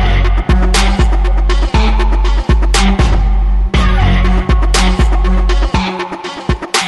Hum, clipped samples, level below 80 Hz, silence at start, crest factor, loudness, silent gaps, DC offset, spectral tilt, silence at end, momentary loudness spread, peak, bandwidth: none; under 0.1%; -10 dBFS; 0 s; 10 dB; -13 LUFS; none; 0.3%; -5 dB/octave; 0 s; 4 LU; 0 dBFS; 12 kHz